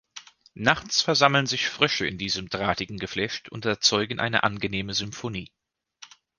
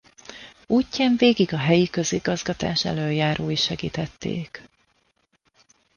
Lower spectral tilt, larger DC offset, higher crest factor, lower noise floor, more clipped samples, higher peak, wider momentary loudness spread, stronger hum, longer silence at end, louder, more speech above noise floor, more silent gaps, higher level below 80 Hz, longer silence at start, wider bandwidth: second, -3 dB/octave vs -5 dB/octave; neither; first, 24 dB vs 18 dB; second, -52 dBFS vs -67 dBFS; neither; first, -2 dBFS vs -6 dBFS; second, 12 LU vs 21 LU; neither; second, 0.35 s vs 1.35 s; about the same, -24 LUFS vs -23 LUFS; second, 27 dB vs 45 dB; neither; about the same, -54 dBFS vs -52 dBFS; second, 0.15 s vs 0.3 s; about the same, 11 kHz vs 10 kHz